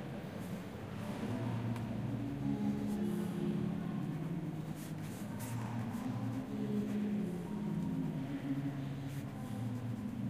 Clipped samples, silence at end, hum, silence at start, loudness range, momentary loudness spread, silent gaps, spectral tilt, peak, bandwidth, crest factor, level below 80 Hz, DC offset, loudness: under 0.1%; 0 s; none; 0 s; 2 LU; 6 LU; none; -7.5 dB/octave; -26 dBFS; 15.5 kHz; 12 dB; -62 dBFS; under 0.1%; -40 LUFS